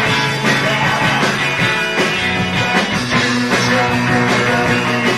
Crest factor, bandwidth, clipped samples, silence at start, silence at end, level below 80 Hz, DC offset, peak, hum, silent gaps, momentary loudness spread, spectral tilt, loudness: 14 dB; 13 kHz; under 0.1%; 0 s; 0 s; -42 dBFS; 0.3%; -2 dBFS; none; none; 1 LU; -4 dB/octave; -14 LUFS